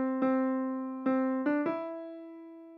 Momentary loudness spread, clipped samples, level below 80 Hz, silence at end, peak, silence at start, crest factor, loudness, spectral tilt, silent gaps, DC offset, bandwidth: 17 LU; under 0.1%; under -90 dBFS; 0 s; -18 dBFS; 0 s; 14 dB; -31 LUFS; -8.5 dB/octave; none; under 0.1%; 4.5 kHz